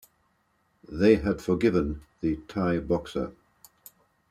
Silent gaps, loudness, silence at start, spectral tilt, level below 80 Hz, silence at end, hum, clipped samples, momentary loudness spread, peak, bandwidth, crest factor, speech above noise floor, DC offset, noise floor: none; -27 LUFS; 0.9 s; -7.5 dB/octave; -46 dBFS; 1 s; none; under 0.1%; 12 LU; -6 dBFS; 15 kHz; 22 dB; 45 dB; under 0.1%; -70 dBFS